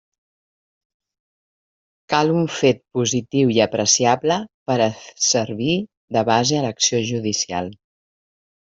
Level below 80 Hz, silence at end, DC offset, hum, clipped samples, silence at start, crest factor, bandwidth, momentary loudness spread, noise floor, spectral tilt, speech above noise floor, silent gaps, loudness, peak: -60 dBFS; 0.9 s; under 0.1%; none; under 0.1%; 2.1 s; 18 dB; 8 kHz; 8 LU; under -90 dBFS; -3.5 dB/octave; over 71 dB; 4.54-4.66 s, 5.97-6.08 s; -19 LUFS; -2 dBFS